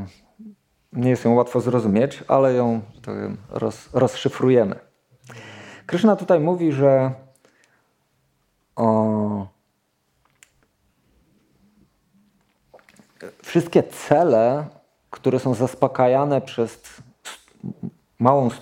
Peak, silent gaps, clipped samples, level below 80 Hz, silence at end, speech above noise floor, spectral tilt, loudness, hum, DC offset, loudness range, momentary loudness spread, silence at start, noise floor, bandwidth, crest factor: -2 dBFS; none; under 0.1%; -62 dBFS; 0 s; 50 dB; -7.5 dB/octave; -20 LUFS; none; under 0.1%; 6 LU; 22 LU; 0 s; -69 dBFS; 16 kHz; 20 dB